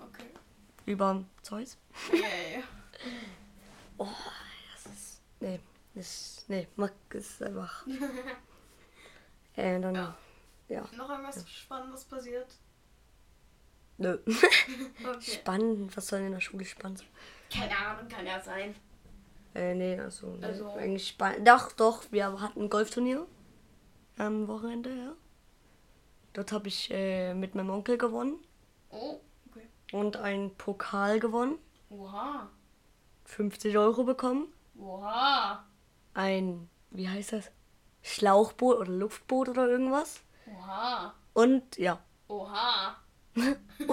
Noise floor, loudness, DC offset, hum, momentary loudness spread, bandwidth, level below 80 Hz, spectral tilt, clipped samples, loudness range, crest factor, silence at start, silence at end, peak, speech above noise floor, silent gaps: -63 dBFS; -31 LUFS; under 0.1%; none; 19 LU; 16.5 kHz; -62 dBFS; -4.5 dB/octave; under 0.1%; 12 LU; 28 dB; 0 s; 0 s; -4 dBFS; 32 dB; none